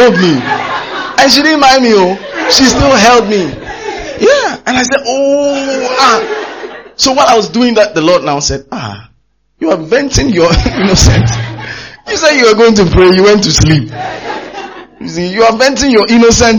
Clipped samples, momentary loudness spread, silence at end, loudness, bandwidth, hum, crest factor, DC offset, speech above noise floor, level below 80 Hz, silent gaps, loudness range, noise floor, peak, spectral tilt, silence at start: 0.6%; 16 LU; 0 s; -8 LUFS; over 20 kHz; none; 8 dB; 0.2%; 46 dB; -24 dBFS; none; 4 LU; -54 dBFS; 0 dBFS; -4 dB/octave; 0 s